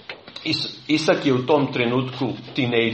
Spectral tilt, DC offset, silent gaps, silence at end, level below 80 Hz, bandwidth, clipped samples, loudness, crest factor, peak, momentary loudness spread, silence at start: -5.5 dB/octave; under 0.1%; none; 0 s; -60 dBFS; 9.2 kHz; under 0.1%; -22 LUFS; 18 dB; -4 dBFS; 8 LU; 0.1 s